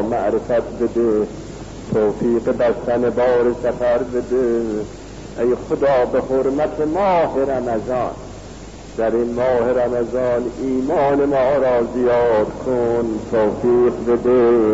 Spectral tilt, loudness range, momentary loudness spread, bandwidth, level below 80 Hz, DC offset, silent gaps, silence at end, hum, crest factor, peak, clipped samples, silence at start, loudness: -7 dB/octave; 3 LU; 10 LU; 8 kHz; -40 dBFS; 0.2%; none; 0 s; none; 10 dB; -6 dBFS; under 0.1%; 0 s; -18 LUFS